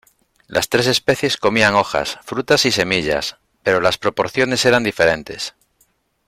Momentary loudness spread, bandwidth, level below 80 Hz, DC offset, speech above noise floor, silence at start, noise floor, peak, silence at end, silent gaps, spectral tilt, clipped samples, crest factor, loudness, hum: 10 LU; 16.5 kHz; -50 dBFS; under 0.1%; 44 dB; 0.5 s; -62 dBFS; -2 dBFS; 0.8 s; none; -3.5 dB/octave; under 0.1%; 16 dB; -17 LUFS; none